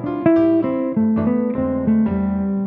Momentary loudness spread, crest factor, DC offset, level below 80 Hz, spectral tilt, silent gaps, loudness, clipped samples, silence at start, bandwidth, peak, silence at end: 5 LU; 14 dB; under 0.1%; -44 dBFS; -11.5 dB/octave; none; -18 LUFS; under 0.1%; 0 s; 3.8 kHz; -4 dBFS; 0 s